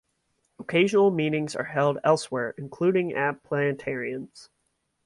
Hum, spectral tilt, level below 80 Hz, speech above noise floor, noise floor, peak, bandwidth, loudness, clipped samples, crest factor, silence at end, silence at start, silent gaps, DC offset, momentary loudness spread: none; -6 dB/octave; -68 dBFS; 50 dB; -75 dBFS; -8 dBFS; 11.5 kHz; -25 LUFS; under 0.1%; 18 dB; 0.6 s; 0.6 s; none; under 0.1%; 12 LU